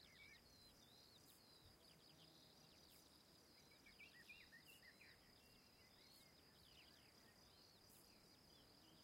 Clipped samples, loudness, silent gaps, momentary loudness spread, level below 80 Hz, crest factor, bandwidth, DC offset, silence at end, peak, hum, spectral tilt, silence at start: under 0.1%; -67 LUFS; none; 5 LU; -84 dBFS; 18 dB; 16 kHz; under 0.1%; 0 s; -52 dBFS; none; -2.5 dB/octave; 0 s